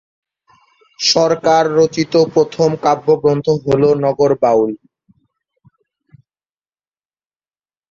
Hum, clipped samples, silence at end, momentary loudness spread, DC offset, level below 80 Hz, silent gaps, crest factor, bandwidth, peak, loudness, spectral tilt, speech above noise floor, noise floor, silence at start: none; under 0.1%; 3.15 s; 4 LU; under 0.1%; -54 dBFS; none; 16 dB; 7.6 kHz; 0 dBFS; -14 LUFS; -5 dB/octave; over 77 dB; under -90 dBFS; 1 s